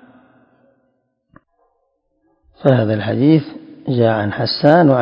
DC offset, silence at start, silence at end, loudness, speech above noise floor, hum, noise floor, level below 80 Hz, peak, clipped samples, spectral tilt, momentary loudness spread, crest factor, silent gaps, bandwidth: under 0.1%; 2.6 s; 0 s; -15 LUFS; 53 dB; none; -66 dBFS; -54 dBFS; 0 dBFS; under 0.1%; -9.5 dB/octave; 10 LU; 18 dB; none; 5.6 kHz